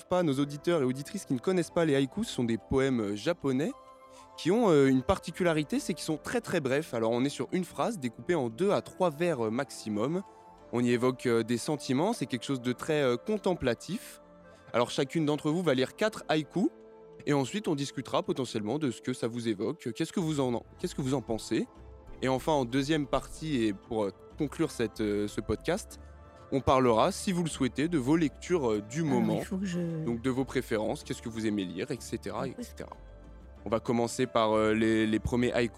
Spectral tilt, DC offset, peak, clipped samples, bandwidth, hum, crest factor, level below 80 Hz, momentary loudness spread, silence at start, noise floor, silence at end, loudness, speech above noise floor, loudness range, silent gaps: -5.5 dB/octave; under 0.1%; -10 dBFS; under 0.1%; 15.5 kHz; none; 20 dB; -54 dBFS; 9 LU; 0 s; -54 dBFS; 0 s; -30 LUFS; 24 dB; 4 LU; none